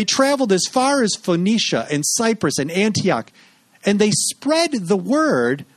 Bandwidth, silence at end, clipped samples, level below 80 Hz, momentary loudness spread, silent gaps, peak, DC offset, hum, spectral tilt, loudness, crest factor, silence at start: 13.5 kHz; 0.15 s; under 0.1%; -62 dBFS; 4 LU; none; -2 dBFS; under 0.1%; none; -3.5 dB/octave; -18 LUFS; 16 dB; 0 s